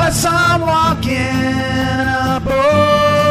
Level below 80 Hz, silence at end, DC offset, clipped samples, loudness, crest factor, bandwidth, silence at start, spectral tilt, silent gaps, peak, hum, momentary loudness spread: -32 dBFS; 0 s; under 0.1%; under 0.1%; -14 LUFS; 12 dB; 15.5 kHz; 0 s; -5 dB/octave; none; -2 dBFS; none; 5 LU